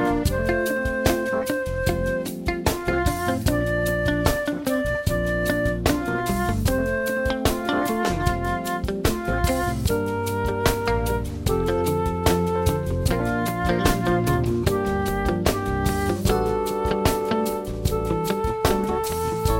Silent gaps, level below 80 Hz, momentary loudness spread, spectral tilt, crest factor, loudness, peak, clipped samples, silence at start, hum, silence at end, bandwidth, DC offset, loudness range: none; -32 dBFS; 3 LU; -5.5 dB/octave; 18 dB; -23 LUFS; -4 dBFS; under 0.1%; 0 s; none; 0 s; 16.5 kHz; under 0.1%; 1 LU